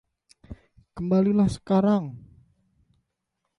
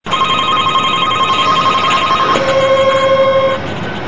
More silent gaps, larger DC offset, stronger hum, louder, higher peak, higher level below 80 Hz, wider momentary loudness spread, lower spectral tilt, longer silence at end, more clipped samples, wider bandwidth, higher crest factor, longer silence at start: neither; second, under 0.1% vs 3%; neither; second, -23 LUFS vs -11 LUFS; second, -10 dBFS vs 0 dBFS; second, -52 dBFS vs -42 dBFS; first, 16 LU vs 3 LU; first, -8.5 dB/octave vs -4 dB/octave; first, 1.4 s vs 0 s; neither; first, 11 kHz vs 8 kHz; about the same, 16 dB vs 12 dB; first, 0.5 s vs 0 s